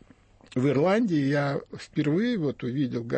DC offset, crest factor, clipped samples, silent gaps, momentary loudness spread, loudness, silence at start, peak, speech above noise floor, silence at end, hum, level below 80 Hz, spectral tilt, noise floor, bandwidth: under 0.1%; 14 dB; under 0.1%; none; 9 LU; -26 LUFS; 0.55 s; -12 dBFS; 30 dB; 0 s; none; -62 dBFS; -7.5 dB/octave; -56 dBFS; 8.6 kHz